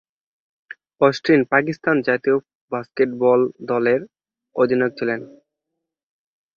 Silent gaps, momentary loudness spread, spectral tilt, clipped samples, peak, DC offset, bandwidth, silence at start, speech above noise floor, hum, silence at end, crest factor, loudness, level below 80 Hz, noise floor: 2.55-2.68 s; 12 LU; -7 dB/octave; under 0.1%; -2 dBFS; under 0.1%; 7 kHz; 1 s; 63 dB; none; 1.3 s; 18 dB; -20 LUFS; -64 dBFS; -81 dBFS